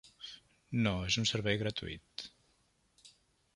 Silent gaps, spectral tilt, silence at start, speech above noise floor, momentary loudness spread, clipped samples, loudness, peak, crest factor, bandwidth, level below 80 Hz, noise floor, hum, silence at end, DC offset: none; -4.5 dB/octave; 0.05 s; 40 dB; 18 LU; under 0.1%; -35 LUFS; -16 dBFS; 22 dB; 11.5 kHz; -58 dBFS; -73 dBFS; none; 0.45 s; under 0.1%